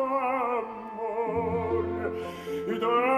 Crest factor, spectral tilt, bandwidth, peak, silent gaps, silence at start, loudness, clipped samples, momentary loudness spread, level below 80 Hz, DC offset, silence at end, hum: 16 dB; -7 dB/octave; 14 kHz; -12 dBFS; none; 0 s; -29 LUFS; under 0.1%; 8 LU; -54 dBFS; under 0.1%; 0 s; none